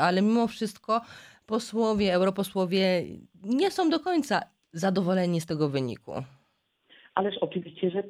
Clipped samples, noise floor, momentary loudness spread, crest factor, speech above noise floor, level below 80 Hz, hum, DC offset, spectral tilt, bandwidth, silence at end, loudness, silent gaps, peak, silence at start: under 0.1%; -72 dBFS; 13 LU; 18 dB; 45 dB; -62 dBFS; none; under 0.1%; -6 dB/octave; 15 kHz; 0 s; -27 LUFS; none; -10 dBFS; 0 s